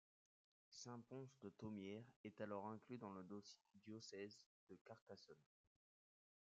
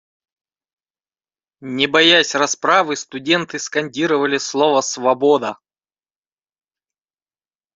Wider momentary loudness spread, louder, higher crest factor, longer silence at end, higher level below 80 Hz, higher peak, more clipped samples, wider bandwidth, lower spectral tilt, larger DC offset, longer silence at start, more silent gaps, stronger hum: about the same, 12 LU vs 11 LU; second, -57 LUFS vs -16 LUFS; about the same, 20 dB vs 20 dB; second, 1.15 s vs 2.2 s; second, under -90 dBFS vs -66 dBFS; second, -38 dBFS vs 0 dBFS; neither; about the same, 7.6 kHz vs 8 kHz; first, -5.5 dB/octave vs -2.5 dB/octave; neither; second, 0.7 s vs 1.6 s; first, 2.16-2.24 s, 4.46-4.67 s, 4.81-4.85 s, 5.01-5.07 s vs none; neither